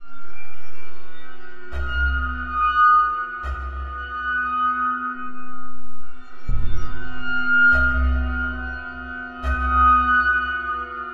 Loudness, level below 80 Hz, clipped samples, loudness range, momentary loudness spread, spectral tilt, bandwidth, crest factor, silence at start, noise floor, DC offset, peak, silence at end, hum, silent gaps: -21 LUFS; -30 dBFS; under 0.1%; 7 LU; 19 LU; -6.5 dB/octave; 6 kHz; 12 dB; 0.05 s; -39 dBFS; under 0.1%; -6 dBFS; 0 s; none; none